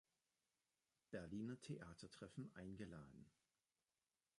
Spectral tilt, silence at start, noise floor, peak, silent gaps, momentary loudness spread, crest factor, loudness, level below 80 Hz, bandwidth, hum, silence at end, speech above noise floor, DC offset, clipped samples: -6.5 dB/octave; 1.1 s; under -90 dBFS; -38 dBFS; none; 9 LU; 20 dB; -56 LUFS; -78 dBFS; 11 kHz; none; 1.1 s; over 35 dB; under 0.1%; under 0.1%